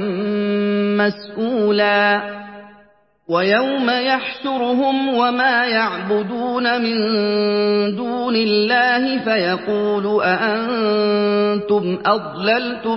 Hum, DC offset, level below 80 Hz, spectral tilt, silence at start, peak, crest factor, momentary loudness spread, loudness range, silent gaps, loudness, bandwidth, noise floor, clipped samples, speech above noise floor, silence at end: none; under 0.1%; -62 dBFS; -9.5 dB/octave; 0 s; -2 dBFS; 16 dB; 6 LU; 2 LU; none; -18 LUFS; 5.8 kHz; -53 dBFS; under 0.1%; 36 dB; 0 s